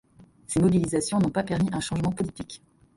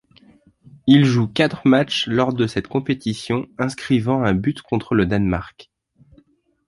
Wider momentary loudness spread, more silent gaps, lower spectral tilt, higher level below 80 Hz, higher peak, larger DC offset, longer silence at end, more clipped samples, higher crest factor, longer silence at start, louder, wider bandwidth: first, 16 LU vs 10 LU; neither; about the same, -6 dB/octave vs -6.5 dB/octave; second, -50 dBFS vs -44 dBFS; second, -10 dBFS vs -2 dBFS; neither; second, 0.4 s vs 1.05 s; neither; about the same, 16 dB vs 18 dB; second, 0.2 s vs 0.85 s; second, -26 LUFS vs -19 LUFS; about the same, 11.5 kHz vs 11.5 kHz